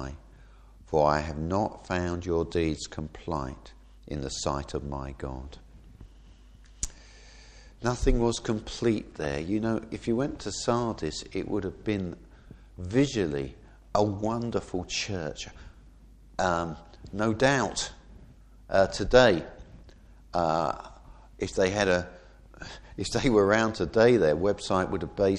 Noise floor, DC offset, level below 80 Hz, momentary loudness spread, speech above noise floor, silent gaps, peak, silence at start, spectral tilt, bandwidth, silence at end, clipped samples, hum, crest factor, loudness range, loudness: -52 dBFS; under 0.1%; -42 dBFS; 16 LU; 25 dB; none; -4 dBFS; 0 s; -5 dB/octave; 11.5 kHz; 0 s; under 0.1%; none; 24 dB; 10 LU; -28 LUFS